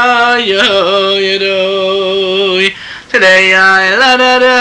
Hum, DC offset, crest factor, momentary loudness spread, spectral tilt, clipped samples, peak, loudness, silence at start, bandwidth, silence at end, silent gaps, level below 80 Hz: none; under 0.1%; 8 dB; 7 LU; -2.5 dB/octave; under 0.1%; 0 dBFS; -8 LUFS; 0 s; 10.5 kHz; 0 s; none; -50 dBFS